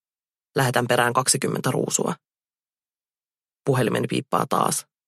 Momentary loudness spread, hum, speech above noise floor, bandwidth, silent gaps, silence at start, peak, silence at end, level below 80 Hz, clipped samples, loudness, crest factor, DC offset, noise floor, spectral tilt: 8 LU; none; over 68 dB; 15 kHz; none; 0.55 s; -4 dBFS; 0.25 s; -66 dBFS; under 0.1%; -22 LUFS; 20 dB; under 0.1%; under -90 dBFS; -4 dB/octave